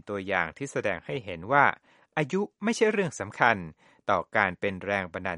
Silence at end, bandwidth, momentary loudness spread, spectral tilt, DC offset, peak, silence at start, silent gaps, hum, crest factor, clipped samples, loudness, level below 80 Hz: 0 s; 11.5 kHz; 11 LU; -5 dB/octave; under 0.1%; -4 dBFS; 0.05 s; none; none; 24 dB; under 0.1%; -27 LUFS; -64 dBFS